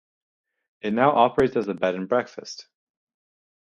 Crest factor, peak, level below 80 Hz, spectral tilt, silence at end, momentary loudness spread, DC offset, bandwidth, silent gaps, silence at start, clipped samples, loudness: 22 dB; -4 dBFS; -60 dBFS; -6 dB/octave; 1 s; 19 LU; under 0.1%; 8.4 kHz; none; 0.85 s; under 0.1%; -22 LUFS